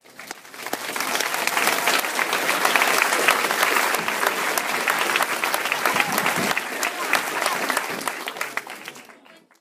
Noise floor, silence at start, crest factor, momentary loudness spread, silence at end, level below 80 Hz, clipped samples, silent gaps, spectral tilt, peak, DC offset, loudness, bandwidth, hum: -50 dBFS; 0.1 s; 24 dB; 12 LU; 0.45 s; -70 dBFS; under 0.1%; none; -1 dB/octave; 0 dBFS; under 0.1%; -21 LUFS; 16 kHz; none